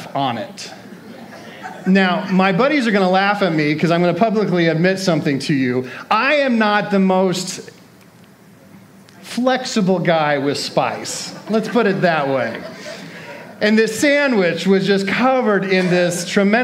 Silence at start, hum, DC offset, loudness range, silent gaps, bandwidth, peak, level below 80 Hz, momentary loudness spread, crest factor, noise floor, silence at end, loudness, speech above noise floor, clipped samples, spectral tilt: 0 s; none; under 0.1%; 4 LU; none; 15 kHz; 0 dBFS; -68 dBFS; 17 LU; 16 dB; -45 dBFS; 0 s; -17 LUFS; 29 dB; under 0.1%; -5.5 dB/octave